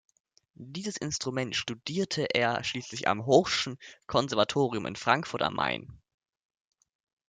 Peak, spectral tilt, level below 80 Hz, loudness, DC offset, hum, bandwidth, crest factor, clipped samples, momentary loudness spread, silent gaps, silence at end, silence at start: -8 dBFS; -4 dB/octave; -64 dBFS; -29 LUFS; under 0.1%; none; 9.6 kHz; 22 dB; under 0.1%; 11 LU; none; 1.35 s; 0.6 s